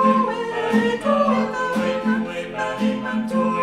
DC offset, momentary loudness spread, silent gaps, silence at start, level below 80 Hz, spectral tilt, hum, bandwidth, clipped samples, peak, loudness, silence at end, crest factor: under 0.1%; 6 LU; none; 0 s; -54 dBFS; -6 dB/octave; none; 11.5 kHz; under 0.1%; -6 dBFS; -21 LUFS; 0 s; 14 dB